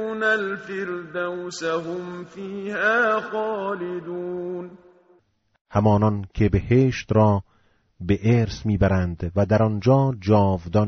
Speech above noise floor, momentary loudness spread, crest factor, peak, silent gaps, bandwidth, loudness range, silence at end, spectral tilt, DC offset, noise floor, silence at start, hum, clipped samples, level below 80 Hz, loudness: 40 dB; 12 LU; 16 dB; -6 dBFS; 5.61-5.65 s; 7.6 kHz; 5 LU; 0 s; -6.5 dB/octave; under 0.1%; -62 dBFS; 0 s; none; under 0.1%; -42 dBFS; -22 LUFS